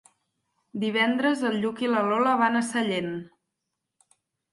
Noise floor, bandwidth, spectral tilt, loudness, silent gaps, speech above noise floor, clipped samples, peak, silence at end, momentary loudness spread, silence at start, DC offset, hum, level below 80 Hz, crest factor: -83 dBFS; 11.5 kHz; -4.5 dB/octave; -25 LUFS; none; 58 dB; under 0.1%; -10 dBFS; 1.25 s; 10 LU; 0.75 s; under 0.1%; none; -72 dBFS; 18 dB